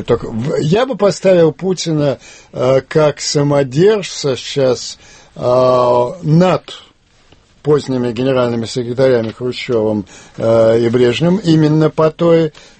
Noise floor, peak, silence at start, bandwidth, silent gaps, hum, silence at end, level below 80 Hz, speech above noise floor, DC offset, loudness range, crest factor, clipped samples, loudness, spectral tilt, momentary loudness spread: -49 dBFS; 0 dBFS; 0 s; 8.8 kHz; none; none; 0.3 s; -46 dBFS; 35 dB; under 0.1%; 3 LU; 14 dB; under 0.1%; -14 LUFS; -6 dB/octave; 10 LU